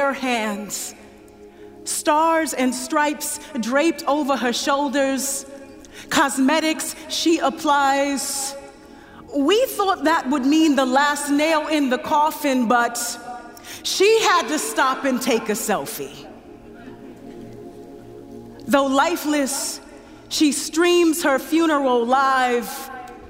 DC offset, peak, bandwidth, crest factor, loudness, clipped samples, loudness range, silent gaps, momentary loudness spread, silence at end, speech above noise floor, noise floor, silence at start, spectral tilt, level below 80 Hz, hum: under 0.1%; -2 dBFS; 16 kHz; 18 dB; -20 LUFS; under 0.1%; 5 LU; none; 21 LU; 0 s; 25 dB; -44 dBFS; 0 s; -2.5 dB/octave; -56 dBFS; none